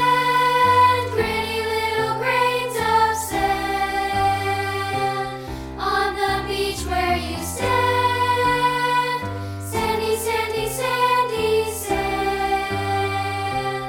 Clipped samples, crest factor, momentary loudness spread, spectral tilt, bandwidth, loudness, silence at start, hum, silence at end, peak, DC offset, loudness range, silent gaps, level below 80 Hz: under 0.1%; 16 dB; 7 LU; -4 dB/octave; 18 kHz; -21 LUFS; 0 s; none; 0 s; -6 dBFS; under 0.1%; 3 LU; none; -40 dBFS